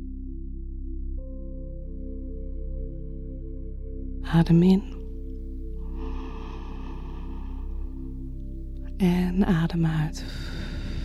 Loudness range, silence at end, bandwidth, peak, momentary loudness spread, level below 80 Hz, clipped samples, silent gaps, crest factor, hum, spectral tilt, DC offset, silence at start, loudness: 12 LU; 0 s; 12.5 kHz; -10 dBFS; 16 LU; -34 dBFS; under 0.1%; none; 18 dB; none; -8 dB/octave; under 0.1%; 0 s; -29 LUFS